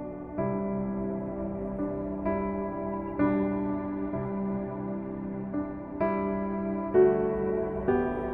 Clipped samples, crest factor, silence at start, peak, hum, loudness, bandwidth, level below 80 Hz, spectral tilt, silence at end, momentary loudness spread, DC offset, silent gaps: under 0.1%; 18 dB; 0 s; -12 dBFS; none; -30 LUFS; 3.8 kHz; -50 dBFS; -11.5 dB/octave; 0 s; 8 LU; under 0.1%; none